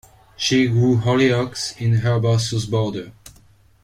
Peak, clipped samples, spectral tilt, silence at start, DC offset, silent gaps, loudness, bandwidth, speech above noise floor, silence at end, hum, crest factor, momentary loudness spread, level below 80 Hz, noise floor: -4 dBFS; under 0.1%; -5.5 dB/octave; 0.4 s; under 0.1%; none; -19 LUFS; 11.5 kHz; 33 dB; 0.55 s; none; 16 dB; 9 LU; -50 dBFS; -52 dBFS